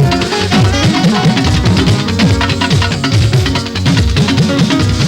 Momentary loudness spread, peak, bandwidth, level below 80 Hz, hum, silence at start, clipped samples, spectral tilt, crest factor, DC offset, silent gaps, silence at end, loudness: 2 LU; 0 dBFS; 14 kHz; -24 dBFS; none; 0 s; under 0.1%; -5.5 dB/octave; 10 dB; under 0.1%; none; 0 s; -11 LUFS